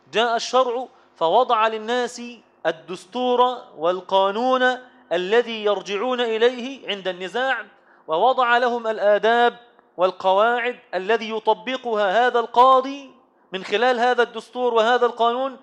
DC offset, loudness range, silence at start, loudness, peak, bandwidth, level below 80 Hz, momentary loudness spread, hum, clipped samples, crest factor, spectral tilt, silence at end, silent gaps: under 0.1%; 3 LU; 0.15 s; -20 LUFS; -4 dBFS; 10.5 kHz; -76 dBFS; 10 LU; none; under 0.1%; 18 dB; -3.5 dB/octave; 0.05 s; none